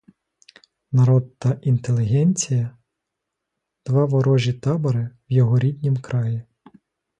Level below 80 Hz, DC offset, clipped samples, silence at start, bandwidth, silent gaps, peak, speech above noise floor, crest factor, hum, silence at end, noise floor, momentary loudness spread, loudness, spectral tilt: -56 dBFS; under 0.1%; under 0.1%; 0.9 s; 9.2 kHz; none; -6 dBFS; 62 dB; 14 dB; none; 0.75 s; -81 dBFS; 7 LU; -21 LUFS; -7 dB/octave